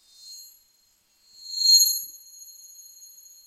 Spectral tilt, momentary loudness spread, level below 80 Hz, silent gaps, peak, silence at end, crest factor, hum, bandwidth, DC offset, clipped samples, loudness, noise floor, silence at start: 7 dB/octave; 28 LU; -84 dBFS; none; -6 dBFS; 1.35 s; 22 dB; none; 15.5 kHz; under 0.1%; under 0.1%; -18 LUFS; -65 dBFS; 0.25 s